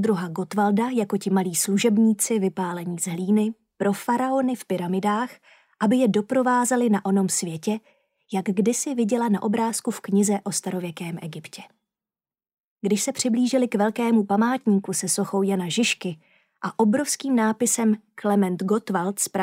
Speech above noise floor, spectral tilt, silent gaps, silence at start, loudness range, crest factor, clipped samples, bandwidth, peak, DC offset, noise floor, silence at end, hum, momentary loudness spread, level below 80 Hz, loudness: over 67 dB; -4.5 dB/octave; 12.58-12.76 s; 0 s; 4 LU; 16 dB; under 0.1%; 16 kHz; -8 dBFS; under 0.1%; under -90 dBFS; 0 s; none; 9 LU; -78 dBFS; -23 LUFS